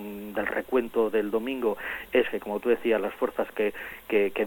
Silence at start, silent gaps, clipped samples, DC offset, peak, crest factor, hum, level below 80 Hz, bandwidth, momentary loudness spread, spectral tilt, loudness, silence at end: 0 s; none; under 0.1%; under 0.1%; -10 dBFS; 16 dB; none; -58 dBFS; 17 kHz; 5 LU; -5.5 dB/octave; -28 LUFS; 0 s